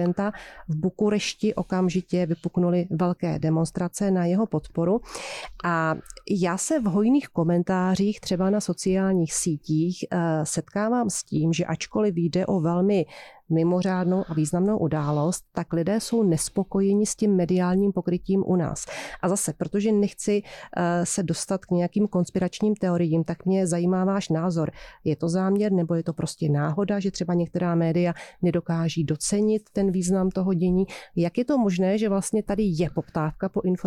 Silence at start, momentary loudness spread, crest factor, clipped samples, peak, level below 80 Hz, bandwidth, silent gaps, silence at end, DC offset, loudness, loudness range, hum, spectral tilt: 0 s; 5 LU; 12 dB; under 0.1%; -12 dBFS; -52 dBFS; 13.5 kHz; none; 0 s; under 0.1%; -25 LUFS; 2 LU; none; -6 dB/octave